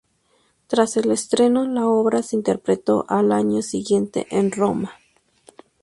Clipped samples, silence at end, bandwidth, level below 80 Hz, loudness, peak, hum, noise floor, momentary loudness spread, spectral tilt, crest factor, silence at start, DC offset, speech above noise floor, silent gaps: under 0.1%; 0.9 s; 11.5 kHz; -60 dBFS; -20 LUFS; -2 dBFS; none; -63 dBFS; 5 LU; -5.5 dB/octave; 18 dB; 0.7 s; under 0.1%; 44 dB; none